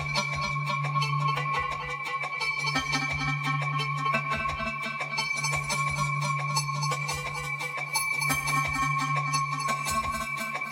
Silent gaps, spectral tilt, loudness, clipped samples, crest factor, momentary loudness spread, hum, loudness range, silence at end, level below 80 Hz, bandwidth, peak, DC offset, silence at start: none; -3.5 dB/octave; -28 LUFS; under 0.1%; 18 dB; 5 LU; none; 1 LU; 0 s; -52 dBFS; 17 kHz; -12 dBFS; under 0.1%; 0 s